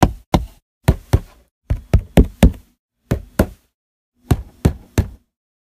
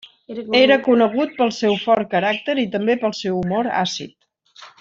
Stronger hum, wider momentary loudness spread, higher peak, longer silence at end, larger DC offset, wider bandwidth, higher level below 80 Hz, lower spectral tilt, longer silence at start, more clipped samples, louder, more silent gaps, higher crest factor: neither; about the same, 11 LU vs 10 LU; about the same, 0 dBFS vs -2 dBFS; first, 0.55 s vs 0.1 s; neither; first, 16 kHz vs 7.6 kHz; first, -22 dBFS vs -60 dBFS; first, -7 dB/octave vs -5 dB/octave; second, 0 s vs 0.3 s; neither; about the same, -19 LUFS vs -18 LUFS; first, 0.26-0.32 s, 0.62-0.81 s, 1.51-1.61 s, 2.79-2.89 s, 3.74-4.12 s vs none; about the same, 18 dB vs 18 dB